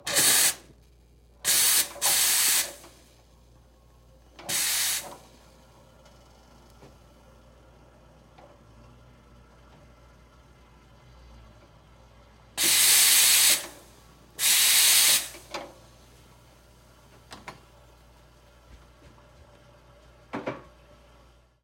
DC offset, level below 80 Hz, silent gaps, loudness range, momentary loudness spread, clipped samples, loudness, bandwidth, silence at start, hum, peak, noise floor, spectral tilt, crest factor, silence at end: under 0.1%; -58 dBFS; none; 25 LU; 24 LU; under 0.1%; -20 LUFS; 16.5 kHz; 0.05 s; none; -6 dBFS; -57 dBFS; 1.5 dB/octave; 22 dB; 1.05 s